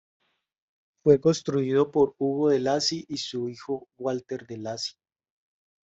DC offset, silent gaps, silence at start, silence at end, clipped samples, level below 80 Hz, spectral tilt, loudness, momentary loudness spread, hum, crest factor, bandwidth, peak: under 0.1%; none; 1.05 s; 0.95 s; under 0.1%; -64 dBFS; -5.5 dB/octave; -26 LUFS; 13 LU; none; 20 dB; 8 kHz; -6 dBFS